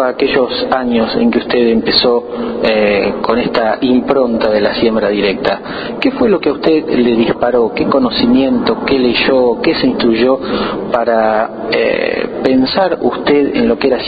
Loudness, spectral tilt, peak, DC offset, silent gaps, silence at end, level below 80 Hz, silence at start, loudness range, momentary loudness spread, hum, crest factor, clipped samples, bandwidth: -13 LUFS; -8 dB/octave; 0 dBFS; under 0.1%; none; 0 s; -42 dBFS; 0 s; 1 LU; 5 LU; none; 12 dB; under 0.1%; 5 kHz